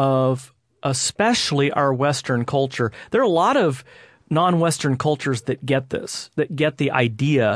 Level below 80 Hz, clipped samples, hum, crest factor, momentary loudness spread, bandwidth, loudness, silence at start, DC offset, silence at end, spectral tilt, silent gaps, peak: -58 dBFS; under 0.1%; none; 18 dB; 8 LU; 11 kHz; -21 LUFS; 0 s; under 0.1%; 0 s; -5 dB/octave; none; -2 dBFS